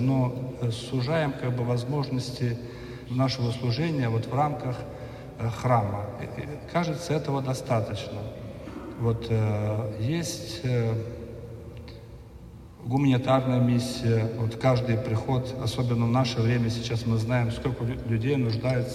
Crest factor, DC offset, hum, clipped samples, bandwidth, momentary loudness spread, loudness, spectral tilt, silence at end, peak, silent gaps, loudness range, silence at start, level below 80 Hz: 18 dB; under 0.1%; none; under 0.1%; 13 kHz; 15 LU; -27 LUFS; -7 dB/octave; 0 s; -10 dBFS; none; 5 LU; 0 s; -48 dBFS